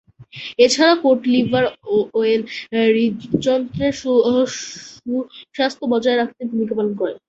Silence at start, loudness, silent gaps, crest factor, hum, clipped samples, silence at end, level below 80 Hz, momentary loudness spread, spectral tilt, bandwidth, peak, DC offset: 0.2 s; -18 LUFS; none; 18 dB; none; under 0.1%; 0.1 s; -54 dBFS; 11 LU; -4.5 dB/octave; 8.4 kHz; -2 dBFS; under 0.1%